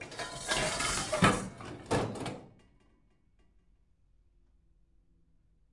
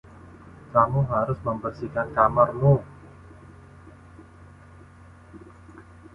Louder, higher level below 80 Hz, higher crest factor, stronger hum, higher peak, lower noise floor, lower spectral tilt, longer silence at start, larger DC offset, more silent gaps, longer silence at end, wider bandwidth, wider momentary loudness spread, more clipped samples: second, -32 LUFS vs -23 LUFS; about the same, -54 dBFS vs -50 dBFS; about the same, 24 dB vs 22 dB; second, none vs 60 Hz at -55 dBFS; second, -12 dBFS vs -4 dBFS; first, -68 dBFS vs -48 dBFS; second, -3.5 dB/octave vs -10.5 dB/octave; second, 0 s vs 0.25 s; neither; neither; first, 3.25 s vs 0.35 s; first, 11.5 kHz vs 5.6 kHz; first, 16 LU vs 11 LU; neither